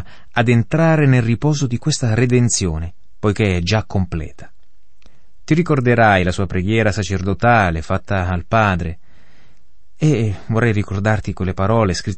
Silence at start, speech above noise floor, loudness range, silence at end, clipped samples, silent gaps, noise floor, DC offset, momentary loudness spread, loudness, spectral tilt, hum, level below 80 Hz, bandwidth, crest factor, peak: 0.05 s; 43 dB; 4 LU; 0 s; under 0.1%; none; -59 dBFS; 3%; 9 LU; -17 LUFS; -6 dB/octave; none; -38 dBFS; 8.8 kHz; 16 dB; -2 dBFS